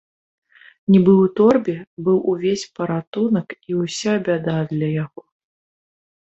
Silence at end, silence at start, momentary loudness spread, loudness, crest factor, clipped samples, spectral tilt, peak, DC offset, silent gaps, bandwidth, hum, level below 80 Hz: 1.25 s; 0.9 s; 11 LU; -19 LUFS; 18 dB; under 0.1%; -7 dB/octave; -2 dBFS; under 0.1%; 1.87-1.97 s, 3.07-3.13 s; 8.2 kHz; none; -60 dBFS